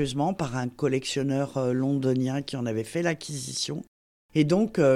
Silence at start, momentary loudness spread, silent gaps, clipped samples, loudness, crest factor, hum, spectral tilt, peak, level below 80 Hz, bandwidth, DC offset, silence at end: 0 s; 7 LU; 3.87-4.29 s; under 0.1%; -27 LUFS; 16 dB; none; -5.5 dB/octave; -10 dBFS; -58 dBFS; 14.5 kHz; under 0.1%; 0 s